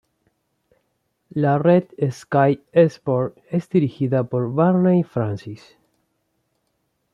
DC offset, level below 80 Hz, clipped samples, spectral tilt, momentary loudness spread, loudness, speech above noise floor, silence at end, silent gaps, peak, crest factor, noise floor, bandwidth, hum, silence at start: under 0.1%; -64 dBFS; under 0.1%; -9 dB/octave; 10 LU; -20 LUFS; 52 dB; 1.55 s; none; -4 dBFS; 18 dB; -71 dBFS; 7.2 kHz; none; 1.35 s